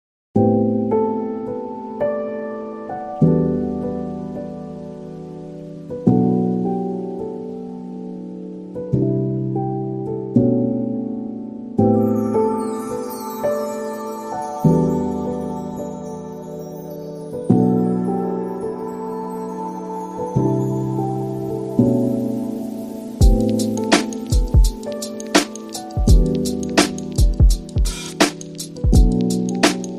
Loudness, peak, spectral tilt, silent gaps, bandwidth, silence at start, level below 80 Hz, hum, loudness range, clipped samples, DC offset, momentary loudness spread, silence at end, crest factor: -21 LUFS; 0 dBFS; -6 dB/octave; none; 15 kHz; 0.35 s; -26 dBFS; none; 4 LU; under 0.1%; under 0.1%; 15 LU; 0 s; 20 dB